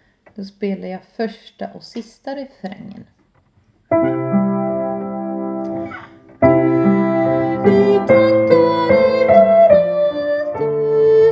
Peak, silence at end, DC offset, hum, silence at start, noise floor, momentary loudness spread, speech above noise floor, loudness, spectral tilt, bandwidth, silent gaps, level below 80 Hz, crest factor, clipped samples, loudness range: 0 dBFS; 0 s; under 0.1%; none; 0.4 s; -57 dBFS; 20 LU; 33 dB; -15 LUFS; -9 dB/octave; 7.4 kHz; none; -48 dBFS; 16 dB; under 0.1%; 16 LU